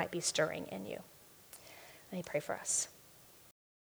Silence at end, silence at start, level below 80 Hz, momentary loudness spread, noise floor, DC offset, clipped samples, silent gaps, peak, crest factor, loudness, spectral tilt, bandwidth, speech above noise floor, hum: 0.35 s; 0 s; -76 dBFS; 24 LU; -60 dBFS; under 0.1%; under 0.1%; none; -18 dBFS; 22 dB; -37 LUFS; -2.5 dB/octave; over 20 kHz; 22 dB; none